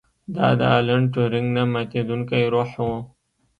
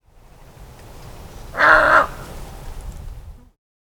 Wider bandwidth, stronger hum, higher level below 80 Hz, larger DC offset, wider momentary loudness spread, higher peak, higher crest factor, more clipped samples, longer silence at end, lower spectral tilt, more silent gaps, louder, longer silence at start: second, 5.2 kHz vs over 20 kHz; neither; second, -52 dBFS vs -38 dBFS; neither; second, 9 LU vs 27 LU; second, -4 dBFS vs 0 dBFS; about the same, 18 dB vs 22 dB; neither; about the same, 0.55 s vs 0.65 s; first, -8.5 dB/octave vs -4 dB/octave; neither; second, -21 LUFS vs -14 LUFS; second, 0.3 s vs 0.6 s